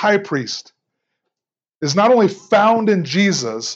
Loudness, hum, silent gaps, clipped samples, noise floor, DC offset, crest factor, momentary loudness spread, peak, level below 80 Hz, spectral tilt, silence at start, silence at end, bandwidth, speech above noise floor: -16 LUFS; none; 1.75-1.80 s; under 0.1%; -89 dBFS; under 0.1%; 16 dB; 11 LU; -2 dBFS; -76 dBFS; -4.5 dB/octave; 0 s; 0 s; 8 kHz; 73 dB